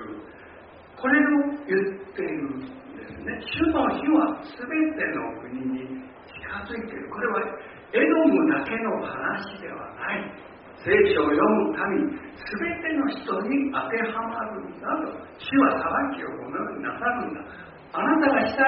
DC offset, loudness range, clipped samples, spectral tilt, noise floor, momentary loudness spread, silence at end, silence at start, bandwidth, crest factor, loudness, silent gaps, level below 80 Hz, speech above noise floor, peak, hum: under 0.1%; 4 LU; under 0.1%; -4 dB/octave; -47 dBFS; 17 LU; 0 s; 0 s; 5 kHz; 20 dB; -25 LUFS; none; -56 dBFS; 22 dB; -6 dBFS; none